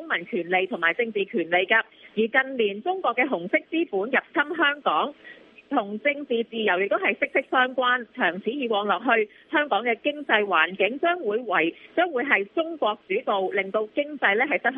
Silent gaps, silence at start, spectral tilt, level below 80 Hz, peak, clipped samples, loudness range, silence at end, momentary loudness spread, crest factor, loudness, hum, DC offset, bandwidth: none; 0 s; -7 dB/octave; -78 dBFS; -4 dBFS; under 0.1%; 2 LU; 0 s; 6 LU; 20 dB; -24 LUFS; none; under 0.1%; 4.2 kHz